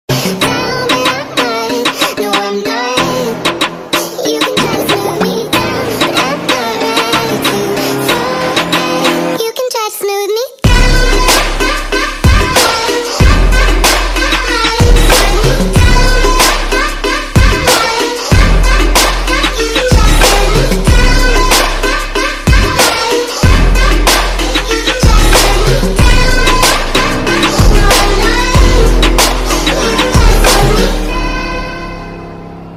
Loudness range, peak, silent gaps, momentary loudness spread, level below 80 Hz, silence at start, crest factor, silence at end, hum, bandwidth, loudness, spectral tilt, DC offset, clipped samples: 3 LU; 0 dBFS; none; 6 LU; -14 dBFS; 0.1 s; 10 dB; 0 s; none; 16 kHz; -10 LUFS; -3.5 dB/octave; under 0.1%; 0.6%